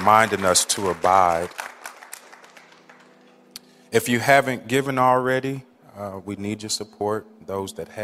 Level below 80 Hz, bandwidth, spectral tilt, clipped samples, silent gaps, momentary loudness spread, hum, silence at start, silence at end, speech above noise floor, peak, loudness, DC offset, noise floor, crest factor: -60 dBFS; 16 kHz; -3.5 dB/octave; under 0.1%; none; 22 LU; none; 0 s; 0 s; 31 dB; -2 dBFS; -21 LUFS; under 0.1%; -52 dBFS; 22 dB